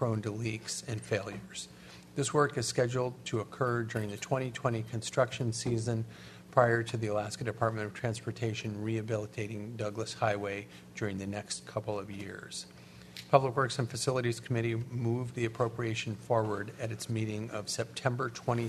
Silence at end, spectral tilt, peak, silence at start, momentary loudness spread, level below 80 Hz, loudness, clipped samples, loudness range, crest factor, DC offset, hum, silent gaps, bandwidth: 0 s; -5 dB/octave; -8 dBFS; 0 s; 12 LU; -66 dBFS; -34 LUFS; under 0.1%; 4 LU; 26 dB; under 0.1%; none; none; 13.5 kHz